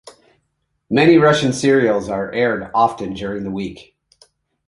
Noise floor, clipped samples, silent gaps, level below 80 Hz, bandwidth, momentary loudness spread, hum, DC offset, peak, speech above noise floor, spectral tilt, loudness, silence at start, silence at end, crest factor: -70 dBFS; under 0.1%; none; -50 dBFS; 11.5 kHz; 14 LU; none; under 0.1%; -2 dBFS; 54 dB; -5.5 dB/octave; -17 LUFS; 0.05 s; 0.85 s; 16 dB